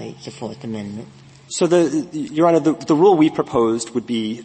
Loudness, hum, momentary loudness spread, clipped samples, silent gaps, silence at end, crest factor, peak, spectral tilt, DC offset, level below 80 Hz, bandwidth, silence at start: -18 LUFS; none; 17 LU; under 0.1%; none; 0 s; 16 dB; -2 dBFS; -5.5 dB/octave; under 0.1%; -58 dBFS; 8.8 kHz; 0 s